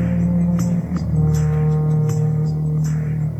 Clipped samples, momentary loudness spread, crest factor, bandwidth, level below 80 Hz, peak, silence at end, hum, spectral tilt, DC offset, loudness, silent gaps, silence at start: under 0.1%; 3 LU; 10 dB; 8.4 kHz; -34 dBFS; -8 dBFS; 0 s; none; -9 dB/octave; under 0.1%; -19 LUFS; none; 0 s